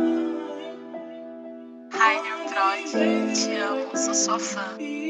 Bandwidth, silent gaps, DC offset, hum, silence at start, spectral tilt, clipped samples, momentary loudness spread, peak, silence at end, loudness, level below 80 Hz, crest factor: 9.4 kHz; none; under 0.1%; none; 0 s; -2 dB/octave; under 0.1%; 18 LU; -6 dBFS; 0 s; -24 LUFS; -88 dBFS; 20 dB